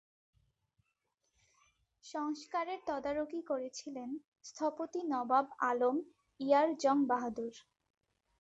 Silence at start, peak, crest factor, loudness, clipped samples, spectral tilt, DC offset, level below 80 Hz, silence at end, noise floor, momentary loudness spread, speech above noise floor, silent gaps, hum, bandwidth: 2.05 s; -16 dBFS; 20 dB; -35 LUFS; under 0.1%; -4 dB/octave; under 0.1%; -76 dBFS; 0.8 s; -83 dBFS; 14 LU; 48 dB; 4.27-4.32 s; none; 8 kHz